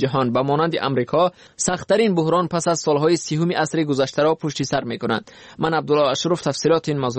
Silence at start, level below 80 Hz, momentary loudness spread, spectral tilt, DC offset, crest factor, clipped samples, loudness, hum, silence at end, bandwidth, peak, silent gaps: 0 s; -56 dBFS; 5 LU; -5 dB/octave; under 0.1%; 14 dB; under 0.1%; -20 LUFS; none; 0 s; 8.8 kHz; -6 dBFS; none